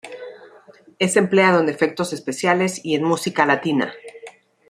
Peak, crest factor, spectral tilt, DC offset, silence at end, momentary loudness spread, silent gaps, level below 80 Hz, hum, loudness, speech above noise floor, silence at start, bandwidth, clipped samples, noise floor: 0 dBFS; 20 dB; -4.5 dB/octave; under 0.1%; 0.4 s; 21 LU; none; -66 dBFS; none; -19 LUFS; 30 dB; 0.05 s; 15.5 kHz; under 0.1%; -48 dBFS